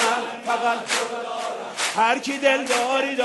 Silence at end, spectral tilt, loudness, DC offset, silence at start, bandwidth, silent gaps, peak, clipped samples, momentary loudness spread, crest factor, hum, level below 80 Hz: 0 s; -1 dB/octave; -22 LUFS; under 0.1%; 0 s; 12 kHz; none; -4 dBFS; under 0.1%; 8 LU; 18 dB; none; -76 dBFS